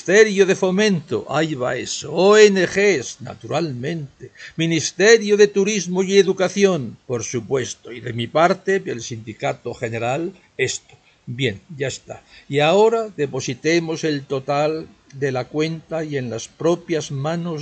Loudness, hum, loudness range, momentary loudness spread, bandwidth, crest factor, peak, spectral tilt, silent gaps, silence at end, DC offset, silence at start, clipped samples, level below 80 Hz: -19 LUFS; none; 6 LU; 15 LU; 8.8 kHz; 20 dB; 0 dBFS; -4.5 dB/octave; none; 0 s; under 0.1%; 0.05 s; under 0.1%; -60 dBFS